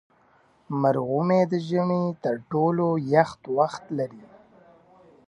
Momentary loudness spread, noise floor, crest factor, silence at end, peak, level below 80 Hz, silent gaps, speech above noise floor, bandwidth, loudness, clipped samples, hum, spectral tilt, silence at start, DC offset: 9 LU; -60 dBFS; 20 dB; 1 s; -4 dBFS; -68 dBFS; none; 37 dB; 9.8 kHz; -24 LUFS; under 0.1%; none; -8 dB/octave; 0.7 s; under 0.1%